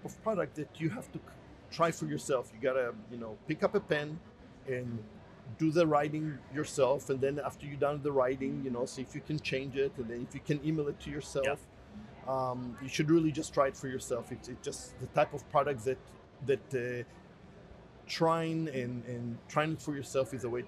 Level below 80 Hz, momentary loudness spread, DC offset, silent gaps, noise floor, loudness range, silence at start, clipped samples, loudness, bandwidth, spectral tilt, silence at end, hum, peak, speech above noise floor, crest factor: -62 dBFS; 14 LU; under 0.1%; none; -54 dBFS; 3 LU; 0 s; under 0.1%; -34 LUFS; 13.5 kHz; -6 dB/octave; 0 s; none; -14 dBFS; 20 dB; 20 dB